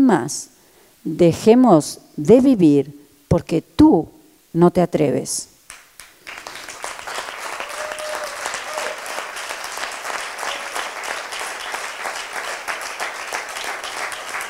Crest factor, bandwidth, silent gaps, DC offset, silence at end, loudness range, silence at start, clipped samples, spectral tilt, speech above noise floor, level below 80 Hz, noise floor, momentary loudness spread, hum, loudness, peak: 20 dB; 16.5 kHz; none; under 0.1%; 0 s; 12 LU; 0 s; under 0.1%; -5 dB/octave; 37 dB; -48 dBFS; -52 dBFS; 17 LU; none; -20 LUFS; 0 dBFS